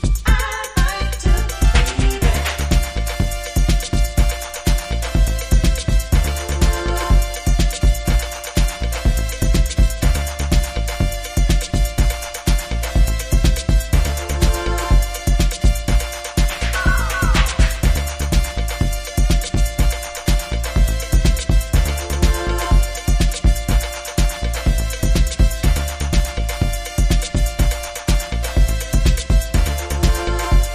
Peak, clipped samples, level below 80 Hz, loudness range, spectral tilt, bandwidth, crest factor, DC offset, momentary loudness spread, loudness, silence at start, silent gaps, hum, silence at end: -2 dBFS; under 0.1%; -18 dBFS; 1 LU; -4.5 dB/octave; 15.5 kHz; 14 dB; under 0.1%; 4 LU; -19 LUFS; 0 s; none; none; 0 s